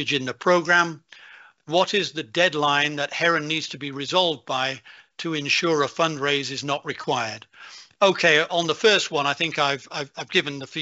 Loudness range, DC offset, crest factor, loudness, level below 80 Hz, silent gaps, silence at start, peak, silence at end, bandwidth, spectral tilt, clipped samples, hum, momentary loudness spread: 3 LU; under 0.1%; 18 dB; -22 LUFS; -70 dBFS; none; 0 s; -4 dBFS; 0 s; 8 kHz; -1.5 dB/octave; under 0.1%; none; 12 LU